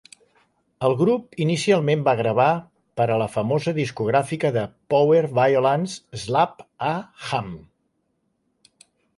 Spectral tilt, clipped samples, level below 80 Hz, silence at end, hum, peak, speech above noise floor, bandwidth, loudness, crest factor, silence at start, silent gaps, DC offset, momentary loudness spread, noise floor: -6 dB/octave; under 0.1%; -60 dBFS; 1.6 s; none; -6 dBFS; 50 dB; 11.5 kHz; -22 LUFS; 18 dB; 0.8 s; none; under 0.1%; 10 LU; -71 dBFS